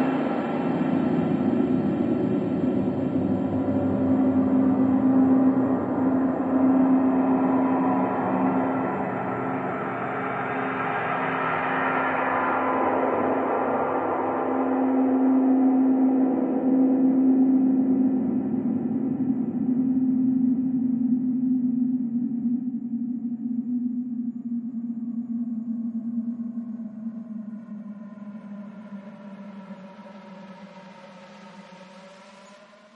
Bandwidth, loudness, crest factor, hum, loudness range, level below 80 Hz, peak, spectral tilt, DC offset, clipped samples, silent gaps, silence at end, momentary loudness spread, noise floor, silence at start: 3.9 kHz; -24 LUFS; 14 dB; none; 17 LU; -70 dBFS; -10 dBFS; -9.5 dB/octave; under 0.1%; under 0.1%; none; 0.4 s; 18 LU; -50 dBFS; 0 s